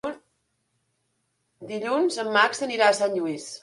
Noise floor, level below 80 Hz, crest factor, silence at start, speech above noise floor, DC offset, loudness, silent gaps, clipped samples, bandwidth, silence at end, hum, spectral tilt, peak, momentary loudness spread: -74 dBFS; -72 dBFS; 20 dB; 0.05 s; 50 dB; under 0.1%; -23 LUFS; none; under 0.1%; 11.5 kHz; 0.05 s; none; -3 dB/octave; -6 dBFS; 12 LU